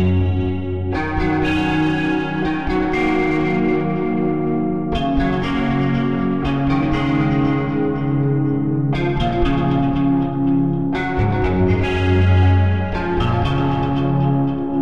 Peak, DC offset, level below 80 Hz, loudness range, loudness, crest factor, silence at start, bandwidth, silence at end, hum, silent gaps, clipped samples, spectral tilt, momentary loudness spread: -4 dBFS; 2%; -32 dBFS; 2 LU; -19 LUFS; 12 dB; 0 s; 7.4 kHz; 0 s; none; none; under 0.1%; -8.5 dB/octave; 3 LU